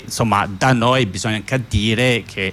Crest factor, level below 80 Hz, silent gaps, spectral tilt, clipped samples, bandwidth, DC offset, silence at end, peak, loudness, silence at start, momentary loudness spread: 14 dB; -38 dBFS; none; -5 dB/octave; under 0.1%; 15.5 kHz; under 0.1%; 0 s; -4 dBFS; -17 LUFS; 0 s; 5 LU